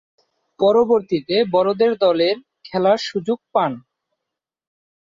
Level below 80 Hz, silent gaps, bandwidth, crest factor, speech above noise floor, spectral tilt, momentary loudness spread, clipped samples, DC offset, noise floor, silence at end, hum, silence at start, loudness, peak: -62 dBFS; none; 7.6 kHz; 16 dB; 66 dB; -6 dB/octave; 8 LU; under 0.1%; under 0.1%; -83 dBFS; 1.25 s; none; 0.6 s; -19 LUFS; -4 dBFS